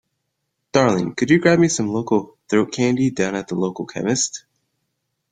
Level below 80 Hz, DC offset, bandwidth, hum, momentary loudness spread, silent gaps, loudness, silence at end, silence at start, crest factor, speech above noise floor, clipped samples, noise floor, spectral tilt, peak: -58 dBFS; under 0.1%; 9.4 kHz; none; 9 LU; none; -19 LUFS; 0.95 s; 0.75 s; 18 dB; 57 dB; under 0.1%; -75 dBFS; -5 dB/octave; -2 dBFS